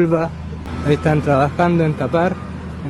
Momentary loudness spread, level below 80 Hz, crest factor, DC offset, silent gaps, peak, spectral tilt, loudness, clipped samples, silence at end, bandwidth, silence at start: 12 LU; -40 dBFS; 16 dB; under 0.1%; none; -2 dBFS; -8 dB/octave; -18 LUFS; under 0.1%; 0 s; 11.5 kHz; 0 s